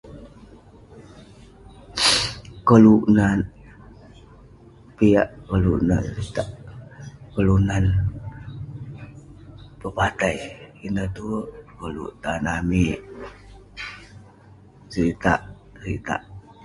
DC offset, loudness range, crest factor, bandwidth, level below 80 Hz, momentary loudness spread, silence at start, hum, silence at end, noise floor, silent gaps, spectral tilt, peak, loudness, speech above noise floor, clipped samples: under 0.1%; 9 LU; 22 dB; 11.5 kHz; -38 dBFS; 22 LU; 0.05 s; none; 0.25 s; -49 dBFS; none; -5.5 dB/octave; 0 dBFS; -21 LUFS; 29 dB; under 0.1%